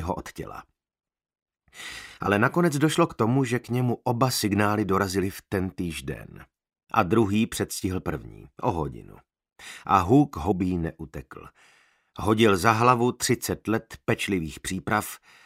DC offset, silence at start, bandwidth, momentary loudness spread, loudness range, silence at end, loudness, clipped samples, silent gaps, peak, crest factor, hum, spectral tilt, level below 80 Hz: under 0.1%; 0 s; 16 kHz; 19 LU; 4 LU; 0.3 s; -25 LUFS; under 0.1%; 1.42-1.46 s; -2 dBFS; 24 dB; none; -5.5 dB/octave; -50 dBFS